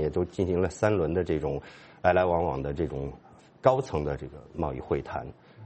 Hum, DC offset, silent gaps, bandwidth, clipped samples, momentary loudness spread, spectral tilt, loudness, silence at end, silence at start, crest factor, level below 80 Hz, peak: none; under 0.1%; none; 8.4 kHz; under 0.1%; 13 LU; -7.5 dB/octave; -28 LUFS; 0 s; 0 s; 22 dB; -46 dBFS; -6 dBFS